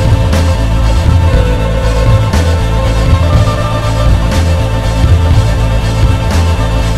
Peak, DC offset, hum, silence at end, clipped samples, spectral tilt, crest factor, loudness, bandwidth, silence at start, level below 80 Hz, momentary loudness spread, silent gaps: 0 dBFS; 4%; none; 0 s; 0.5%; -6.5 dB/octave; 8 dB; -11 LUFS; 13.5 kHz; 0 s; -12 dBFS; 3 LU; none